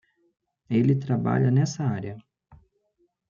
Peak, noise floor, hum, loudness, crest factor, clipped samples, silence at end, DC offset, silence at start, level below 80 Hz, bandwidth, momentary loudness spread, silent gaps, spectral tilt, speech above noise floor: -10 dBFS; -71 dBFS; none; -24 LUFS; 16 dB; under 0.1%; 0.75 s; under 0.1%; 0.7 s; -62 dBFS; 7.4 kHz; 13 LU; none; -7.5 dB/octave; 48 dB